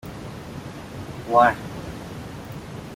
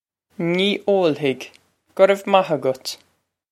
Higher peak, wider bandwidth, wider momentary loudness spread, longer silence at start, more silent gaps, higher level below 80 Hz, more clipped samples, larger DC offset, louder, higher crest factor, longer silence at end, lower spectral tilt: second, -4 dBFS vs 0 dBFS; about the same, 16.5 kHz vs 15 kHz; first, 19 LU vs 15 LU; second, 0.05 s vs 0.4 s; neither; first, -48 dBFS vs -72 dBFS; neither; neither; second, -22 LUFS vs -19 LUFS; about the same, 22 dB vs 20 dB; second, 0 s vs 0.55 s; about the same, -6 dB/octave vs -5 dB/octave